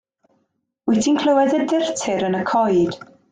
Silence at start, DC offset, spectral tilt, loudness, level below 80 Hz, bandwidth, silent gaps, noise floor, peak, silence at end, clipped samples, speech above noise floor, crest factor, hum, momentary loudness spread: 0.85 s; under 0.1%; -5 dB/octave; -19 LUFS; -60 dBFS; 9.6 kHz; none; -70 dBFS; -6 dBFS; 0.3 s; under 0.1%; 52 dB; 14 dB; none; 7 LU